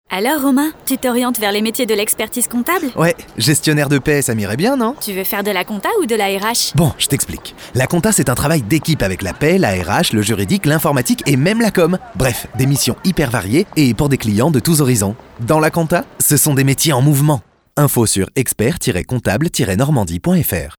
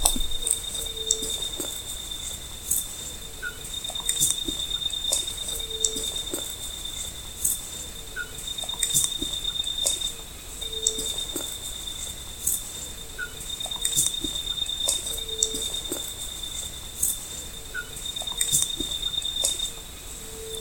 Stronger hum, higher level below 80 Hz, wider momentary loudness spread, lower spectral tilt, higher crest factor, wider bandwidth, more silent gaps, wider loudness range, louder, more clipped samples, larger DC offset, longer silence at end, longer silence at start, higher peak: neither; about the same, -38 dBFS vs -42 dBFS; second, 5 LU vs 12 LU; first, -4.5 dB/octave vs -0.5 dB/octave; second, 12 dB vs 30 dB; first, over 20 kHz vs 17 kHz; neither; about the same, 2 LU vs 3 LU; first, -15 LUFS vs -27 LUFS; neither; neither; about the same, 0.05 s vs 0 s; about the same, 0.1 s vs 0 s; about the same, -2 dBFS vs 0 dBFS